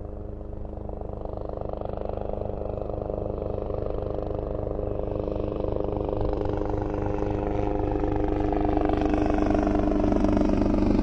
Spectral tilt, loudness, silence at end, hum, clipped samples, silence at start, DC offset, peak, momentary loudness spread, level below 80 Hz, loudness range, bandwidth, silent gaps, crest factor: -9 dB/octave; -28 LUFS; 0 s; none; under 0.1%; 0 s; under 0.1%; -10 dBFS; 11 LU; -32 dBFS; 8 LU; 7 kHz; none; 16 dB